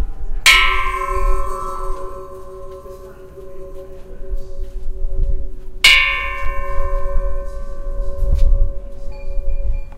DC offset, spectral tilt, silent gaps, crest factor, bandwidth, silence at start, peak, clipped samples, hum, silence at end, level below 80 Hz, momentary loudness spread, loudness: under 0.1%; -2 dB/octave; none; 16 dB; 16 kHz; 0 s; 0 dBFS; under 0.1%; none; 0 s; -20 dBFS; 25 LU; -17 LUFS